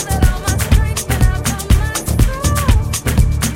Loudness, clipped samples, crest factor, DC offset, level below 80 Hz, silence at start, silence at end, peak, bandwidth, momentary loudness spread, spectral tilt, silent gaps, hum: -16 LUFS; under 0.1%; 14 dB; under 0.1%; -16 dBFS; 0 s; 0 s; 0 dBFS; 17 kHz; 3 LU; -4.5 dB/octave; none; none